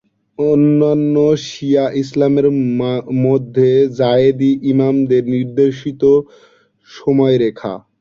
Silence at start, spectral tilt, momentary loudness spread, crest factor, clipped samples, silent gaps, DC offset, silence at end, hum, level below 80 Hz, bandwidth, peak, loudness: 0.4 s; -8 dB/octave; 6 LU; 12 dB; under 0.1%; none; under 0.1%; 0.2 s; none; -54 dBFS; 7.2 kHz; -2 dBFS; -14 LUFS